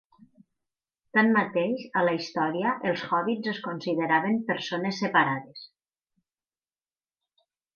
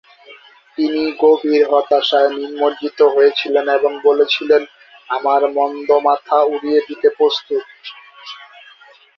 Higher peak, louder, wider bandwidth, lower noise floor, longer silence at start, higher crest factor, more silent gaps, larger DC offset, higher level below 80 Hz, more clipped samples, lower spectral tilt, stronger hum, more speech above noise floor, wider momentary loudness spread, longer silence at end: second, -8 dBFS vs 0 dBFS; second, -26 LUFS vs -15 LUFS; first, 7 kHz vs 6.2 kHz; first, under -90 dBFS vs -46 dBFS; first, 1.15 s vs 0.3 s; about the same, 20 dB vs 16 dB; neither; neither; second, -78 dBFS vs -66 dBFS; neither; first, -6 dB/octave vs -3.5 dB/octave; neither; first, over 64 dB vs 31 dB; second, 8 LU vs 20 LU; first, 2.1 s vs 0.75 s